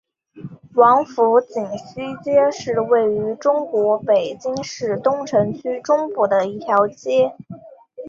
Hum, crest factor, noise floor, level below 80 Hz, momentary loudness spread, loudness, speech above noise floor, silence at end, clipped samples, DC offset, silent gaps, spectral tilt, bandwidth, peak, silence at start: none; 16 dB; -38 dBFS; -62 dBFS; 13 LU; -19 LUFS; 20 dB; 0 s; under 0.1%; under 0.1%; none; -5.5 dB/octave; 7.6 kHz; -2 dBFS; 0.35 s